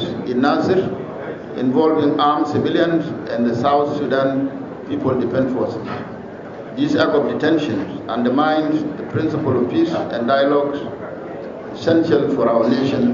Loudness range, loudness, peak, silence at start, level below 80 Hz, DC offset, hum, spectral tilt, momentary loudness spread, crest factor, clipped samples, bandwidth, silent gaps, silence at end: 3 LU; -18 LUFS; -4 dBFS; 0 s; -56 dBFS; under 0.1%; none; -5.5 dB/octave; 13 LU; 14 dB; under 0.1%; 7.4 kHz; none; 0 s